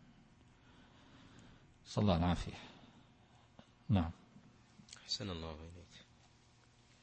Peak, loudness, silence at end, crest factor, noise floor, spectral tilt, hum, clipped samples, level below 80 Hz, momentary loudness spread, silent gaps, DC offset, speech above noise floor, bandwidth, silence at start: -18 dBFS; -38 LUFS; 1.05 s; 24 dB; -67 dBFS; -6 dB/octave; none; under 0.1%; -56 dBFS; 27 LU; none; under 0.1%; 30 dB; 8.4 kHz; 1.4 s